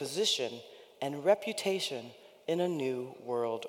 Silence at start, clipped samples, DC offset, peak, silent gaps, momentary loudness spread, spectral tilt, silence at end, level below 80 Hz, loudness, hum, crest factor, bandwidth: 0 s; under 0.1%; under 0.1%; -14 dBFS; none; 15 LU; -3.5 dB/octave; 0 s; -88 dBFS; -33 LUFS; none; 20 dB; 17.5 kHz